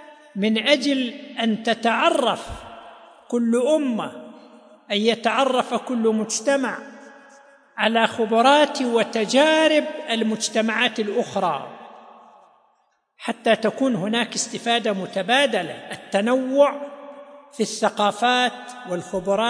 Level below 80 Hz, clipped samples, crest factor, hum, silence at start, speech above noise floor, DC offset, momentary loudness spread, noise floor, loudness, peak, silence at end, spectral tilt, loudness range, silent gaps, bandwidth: -58 dBFS; under 0.1%; 20 dB; none; 0 s; 45 dB; under 0.1%; 15 LU; -66 dBFS; -21 LUFS; -2 dBFS; 0 s; -3.5 dB/octave; 6 LU; none; 10.5 kHz